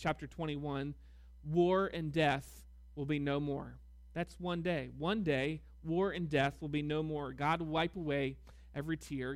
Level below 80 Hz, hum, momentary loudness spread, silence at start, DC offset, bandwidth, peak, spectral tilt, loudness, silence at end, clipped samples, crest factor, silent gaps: -56 dBFS; none; 12 LU; 0 s; under 0.1%; 15.5 kHz; -20 dBFS; -7 dB/octave; -36 LUFS; 0 s; under 0.1%; 16 dB; none